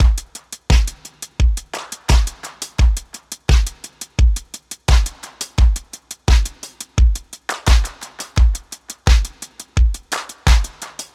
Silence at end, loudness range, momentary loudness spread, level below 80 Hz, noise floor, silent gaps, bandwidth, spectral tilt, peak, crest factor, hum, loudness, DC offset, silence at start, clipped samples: 0.1 s; 1 LU; 15 LU; -18 dBFS; -37 dBFS; none; 14 kHz; -4 dB/octave; -2 dBFS; 16 dB; none; -19 LUFS; under 0.1%; 0 s; under 0.1%